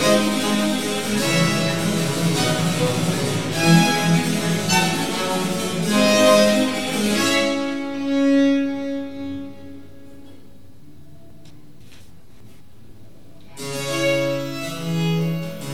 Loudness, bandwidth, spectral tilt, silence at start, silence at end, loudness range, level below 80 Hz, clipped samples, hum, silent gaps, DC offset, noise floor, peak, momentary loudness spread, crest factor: -19 LUFS; 16.5 kHz; -4.5 dB/octave; 0 s; 0 s; 12 LU; -52 dBFS; under 0.1%; none; none; 1%; -48 dBFS; -2 dBFS; 13 LU; 20 dB